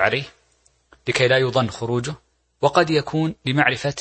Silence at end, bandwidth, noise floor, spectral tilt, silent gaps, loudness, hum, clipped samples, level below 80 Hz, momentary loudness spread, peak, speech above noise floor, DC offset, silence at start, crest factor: 0 s; 8.8 kHz; -62 dBFS; -5 dB/octave; none; -20 LUFS; none; under 0.1%; -54 dBFS; 14 LU; -2 dBFS; 41 dB; under 0.1%; 0 s; 20 dB